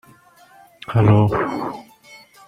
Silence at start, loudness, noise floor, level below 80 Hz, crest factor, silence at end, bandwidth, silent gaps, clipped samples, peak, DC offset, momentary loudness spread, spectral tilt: 0.9 s; -18 LUFS; -50 dBFS; -46 dBFS; 18 dB; 0.3 s; 6 kHz; none; under 0.1%; -2 dBFS; under 0.1%; 21 LU; -9 dB/octave